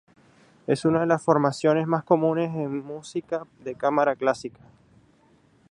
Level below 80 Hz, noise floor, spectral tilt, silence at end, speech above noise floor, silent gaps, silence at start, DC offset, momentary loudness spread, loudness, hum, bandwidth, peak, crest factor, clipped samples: -66 dBFS; -60 dBFS; -7 dB/octave; 1.25 s; 36 dB; none; 0.7 s; under 0.1%; 12 LU; -24 LUFS; none; 11.5 kHz; -4 dBFS; 20 dB; under 0.1%